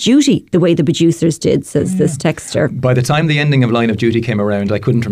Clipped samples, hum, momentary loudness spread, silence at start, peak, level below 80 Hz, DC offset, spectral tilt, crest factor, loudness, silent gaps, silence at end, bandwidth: under 0.1%; none; 4 LU; 0 s; -2 dBFS; -44 dBFS; under 0.1%; -6 dB/octave; 10 dB; -14 LUFS; none; 0 s; 15 kHz